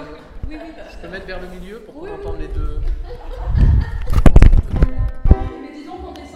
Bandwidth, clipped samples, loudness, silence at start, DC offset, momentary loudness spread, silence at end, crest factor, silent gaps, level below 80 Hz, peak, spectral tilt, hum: 8.2 kHz; 0.3%; -18 LUFS; 0 s; under 0.1%; 20 LU; 0.05 s; 16 dB; none; -16 dBFS; 0 dBFS; -8 dB/octave; none